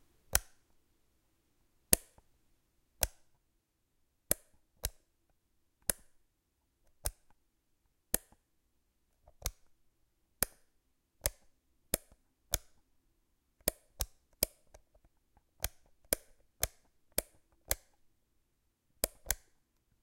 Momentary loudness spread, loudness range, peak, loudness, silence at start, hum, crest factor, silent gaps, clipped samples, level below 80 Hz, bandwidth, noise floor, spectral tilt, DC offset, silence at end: 9 LU; 6 LU; -2 dBFS; -37 LUFS; 0.3 s; none; 40 dB; none; under 0.1%; -54 dBFS; 16.5 kHz; -80 dBFS; -1.5 dB/octave; under 0.1%; 0.7 s